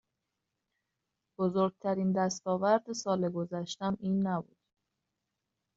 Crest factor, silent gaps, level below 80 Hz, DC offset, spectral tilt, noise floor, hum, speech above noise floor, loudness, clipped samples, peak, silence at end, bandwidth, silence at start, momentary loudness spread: 20 dB; none; -74 dBFS; under 0.1%; -6.5 dB/octave; -86 dBFS; none; 55 dB; -32 LUFS; under 0.1%; -14 dBFS; 1.35 s; 7.8 kHz; 1.4 s; 7 LU